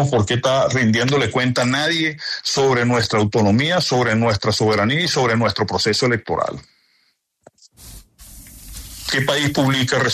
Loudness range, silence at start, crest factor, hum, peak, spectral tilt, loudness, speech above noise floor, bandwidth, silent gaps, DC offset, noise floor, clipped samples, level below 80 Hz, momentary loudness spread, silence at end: 8 LU; 0 s; 14 dB; none; -4 dBFS; -4.5 dB/octave; -18 LUFS; 47 dB; 13.5 kHz; none; under 0.1%; -64 dBFS; under 0.1%; -48 dBFS; 7 LU; 0 s